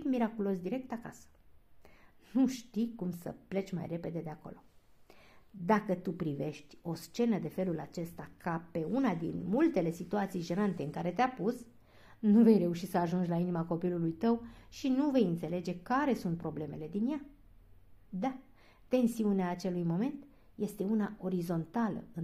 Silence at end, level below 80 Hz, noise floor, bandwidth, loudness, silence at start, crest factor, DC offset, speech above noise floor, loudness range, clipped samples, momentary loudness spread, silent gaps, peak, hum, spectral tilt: 0 s; -64 dBFS; -59 dBFS; 15 kHz; -34 LUFS; 0 s; 18 dB; under 0.1%; 26 dB; 7 LU; under 0.1%; 12 LU; none; -14 dBFS; none; -7.5 dB/octave